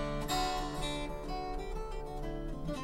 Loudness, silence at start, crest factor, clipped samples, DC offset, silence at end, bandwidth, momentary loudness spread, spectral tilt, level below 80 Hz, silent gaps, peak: -38 LUFS; 0 s; 16 dB; under 0.1%; under 0.1%; 0 s; 16 kHz; 8 LU; -4.5 dB/octave; -42 dBFS; none; -20 dBFS